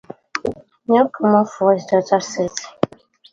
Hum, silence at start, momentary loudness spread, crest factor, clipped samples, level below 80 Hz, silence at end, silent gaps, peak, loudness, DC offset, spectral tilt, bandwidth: none; 0.35 s; 11 LU; 18 dB; under 0.1%; -56 dBFS; 0.45 s; none; 0 dBFS; -19 LUFS; under 0.1%; -5.5 dB/octave; 7.8 kHz